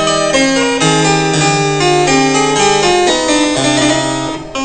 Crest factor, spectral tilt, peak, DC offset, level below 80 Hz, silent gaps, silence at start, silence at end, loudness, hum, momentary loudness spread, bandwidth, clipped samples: 12 dB; -3.5 dB/octave; 0 dBFS; 0.5%; -38 dBFS; none; 0 s; 0 s; -11 LUFS; none; 2 LU; 9.2 kHz; under 0.1%